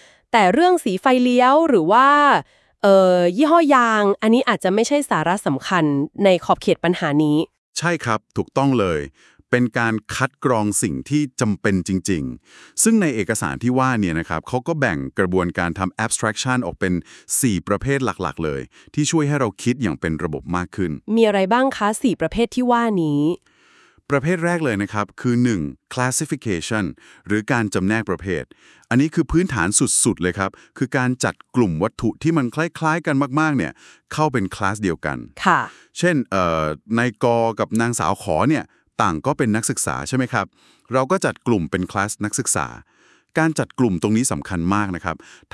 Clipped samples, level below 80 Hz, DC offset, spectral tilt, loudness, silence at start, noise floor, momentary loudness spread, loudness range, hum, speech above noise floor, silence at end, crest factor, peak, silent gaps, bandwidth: under 0.1%; -48 dBFS; under 0.1%; -5 dB/octave; -19 LUFS; 0.35 s; -54 dBFS; 9 LU; 6 LU; none; 35 dB; 0.35 s; 20 dB; 0 dBFS; 7.58-7.73 s; 12 kHz